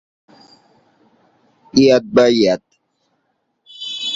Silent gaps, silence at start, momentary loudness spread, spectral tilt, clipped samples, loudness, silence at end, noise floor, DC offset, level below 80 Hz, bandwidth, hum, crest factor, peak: none; 1.75 s; 14 LU; -5 dB/octave; under 0.1%; -15 LUFS; 0 s; -68 dBFS; under 0.1%; -56 dBFS; 7.8 kHz; none; 18 dB; -2 dBFS